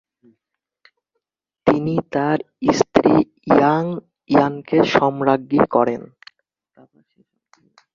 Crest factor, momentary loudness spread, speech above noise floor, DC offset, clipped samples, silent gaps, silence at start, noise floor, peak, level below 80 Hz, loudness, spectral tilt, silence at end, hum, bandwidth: 18 dB; 7 LU; 64 dB; under 0.1%; under 0.1%; none; 1.65 s; -81 dBFS; -2 dBFS; -54 dBFS; -18 LUFS; -6.5 dB/octave; 1.9 s; none; 7.4 kHz